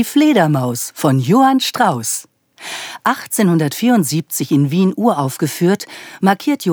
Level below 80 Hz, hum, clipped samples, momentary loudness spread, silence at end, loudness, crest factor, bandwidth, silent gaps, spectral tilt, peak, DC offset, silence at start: -72 dBFS; none; under 0.1%; 9 LU; 0 s; -15 LUFS; 16 dB; over 20 kHz; none; -5 dB/octave; 0 dBFS; under 0.1%; 0 s